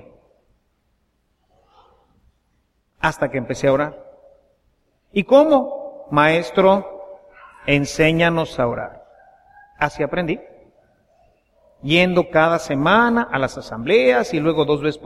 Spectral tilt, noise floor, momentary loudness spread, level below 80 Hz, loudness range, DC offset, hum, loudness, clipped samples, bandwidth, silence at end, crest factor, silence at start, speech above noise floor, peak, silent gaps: -6 dB/octave; -66 dBFS; 13 LU; -48 dBFS; 9 LU; under 0.1%; none; -18 LUFS; under 0.1%; 13.5 kHz; 0 s; 20 dB; 3.05 s; 49 dB; 0 dBFS; none